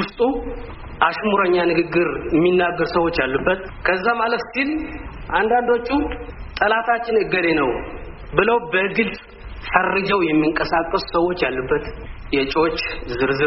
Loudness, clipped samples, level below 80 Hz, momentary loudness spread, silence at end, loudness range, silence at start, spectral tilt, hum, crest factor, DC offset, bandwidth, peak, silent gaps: -19 LUFS; under 0.1%; -38 dBFS; 14 LU; 0 s; 2 LU; 0 s; -3.5 dB/octave; none; 20 dB; under 0.1%; 6 kHz; 0 dBFS; none